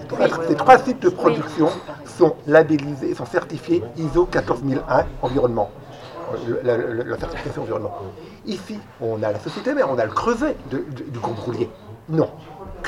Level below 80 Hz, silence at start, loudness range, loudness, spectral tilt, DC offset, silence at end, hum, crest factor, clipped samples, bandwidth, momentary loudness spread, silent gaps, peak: -44 dBFS; 0 s; 8 LU; -21 LUFS; -7 dB/octave; under 0.1%; 0 s; none; 20 dB; under 0.1%; 12 kHz; 16 LU; none; 0 dBFS